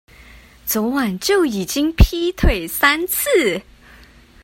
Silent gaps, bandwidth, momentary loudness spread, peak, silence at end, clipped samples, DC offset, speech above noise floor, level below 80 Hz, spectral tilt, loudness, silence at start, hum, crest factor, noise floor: none; 16.5 kHz; 5 LU; 0 dBFS; 0.8 s; under 0.1%; under 0.1%; 29 dB; -26 dBFS; -4.5 dB/octave; -18 LUFS; 0.65 s; none; 18 dB; -46 dBFS